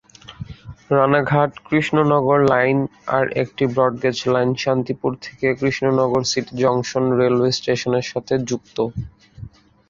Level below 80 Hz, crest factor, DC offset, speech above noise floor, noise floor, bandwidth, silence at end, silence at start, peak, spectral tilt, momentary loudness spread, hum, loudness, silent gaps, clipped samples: -50 dBFS; 18 dB; under 0.1%; 21 dB; -40 dBFS; 7.8 kHz; 0.4 s; 0.3 s; -2 dBFS; -5.5 dB/octave; 9 LU; none; -19 LUFS; none; under 0.1%